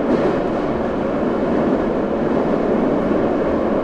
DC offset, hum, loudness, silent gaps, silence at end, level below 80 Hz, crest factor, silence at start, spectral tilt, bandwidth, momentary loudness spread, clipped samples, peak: under 0.1%; none; -19 LUFS; none; 0 s; -38 dBFS; 14 dB; 0 s; -8.5 dB/octave; 8.6 kHz; 3 LU; under 0.1%; -4 dBFS